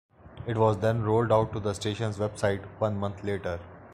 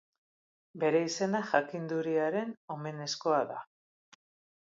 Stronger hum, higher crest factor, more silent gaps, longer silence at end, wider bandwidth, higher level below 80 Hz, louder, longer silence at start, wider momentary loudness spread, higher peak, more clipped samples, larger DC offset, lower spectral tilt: neither; about the same, 18 dB vs 22 dB; second, none vs 2.57-2.68 s; second, 0 s vs 1.05 s; first, 11.5 kHz vs 7.8 kHz; first, -54 dBFS vs -84 dBFS; first, -28 LUFS vs -32 LUFS; second, 0.25 s vs 0.75 s; about the same, 9 LU vs 11 LU; about the same, -10 dBFS vs -12 dBFS; neither; neither; first, -6.5 dB/octave vs -4.5 dB/octave